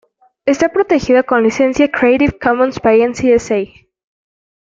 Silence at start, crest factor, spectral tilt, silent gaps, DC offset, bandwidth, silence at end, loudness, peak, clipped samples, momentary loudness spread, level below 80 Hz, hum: 0.45 s; 12 dB; -5.5 dB/octave; none; under 0.1%; 7.8 kHz; 1.1 s; -13 LUFS; -2 dBFS; under 0.1%; 7 LU; -42 dBFS; none